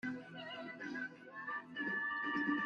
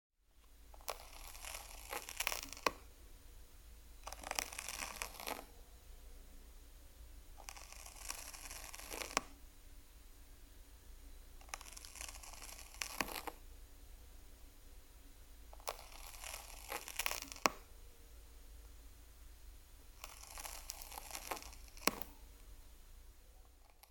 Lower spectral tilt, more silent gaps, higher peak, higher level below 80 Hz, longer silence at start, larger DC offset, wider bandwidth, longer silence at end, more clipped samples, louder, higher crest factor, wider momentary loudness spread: first, -5.5 dB/octave vs -1.5 dB/octave; neither; second, -26 dBFS vs -8 dBFS; second, -82 dBFS vs -58 dBFS; second, 0.05 s vs 0.3 s; neither; second, 7.4 kHz vs 17.5 kHz; about the same, 0 s vs 0 s; neither; first, -42 LUFS vs -45 LUFS; second, 16 dB vs 40 dB; second, 10 LU vs 22 LU